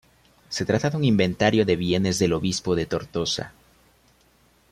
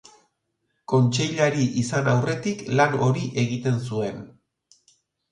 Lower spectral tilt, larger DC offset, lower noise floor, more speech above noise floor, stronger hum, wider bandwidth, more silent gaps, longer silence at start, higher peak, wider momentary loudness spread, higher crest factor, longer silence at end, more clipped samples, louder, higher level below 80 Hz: about the same, -5 dB/octave vs -6 dB/octave; neither; second, -60 dBFS vs -75 dBFS; second, 37 dB vs 53 dB; neither; first, 14.5 kHz vs 10.5 kHz; neither; second, 0.5 s vs 0.9 s; about the same, -4 dBFS vs -6 dBFS; about the same, 8 LU vs 8 LU; about the same, 20 dB vs 18 dB; first, 1.2 s vs 1 s; neither; about the same, -23 LUFS vs -23 LUFS; first, -52 dBFS vs -58 dBFS